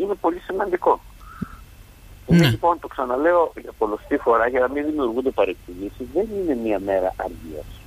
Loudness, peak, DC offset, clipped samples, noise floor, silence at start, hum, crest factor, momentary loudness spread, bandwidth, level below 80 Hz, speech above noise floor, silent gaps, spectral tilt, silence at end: -22 LUFS; -4 dBFS; under 0.1%; under 0.1%; -44 dBFS; 0 s; none; 18 dB; 16 LU; 15.5 kHz; -44 dBFS; 23 dB; none; -7 dB/octave; 0.05 s